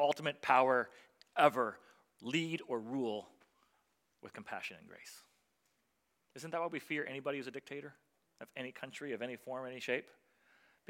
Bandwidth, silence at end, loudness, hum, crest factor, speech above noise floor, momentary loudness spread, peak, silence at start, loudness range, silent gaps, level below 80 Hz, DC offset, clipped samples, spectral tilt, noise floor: 16.5 kHz; 0.85 s; -37 LUFS; none; 26 dB; 44 dB; 23 LU; -12 dBFS; 0 s; 12 LU; none; under -90 dBFS; under 0.1%; under 0.1%; -4.5 dB/octave; -81 dBFS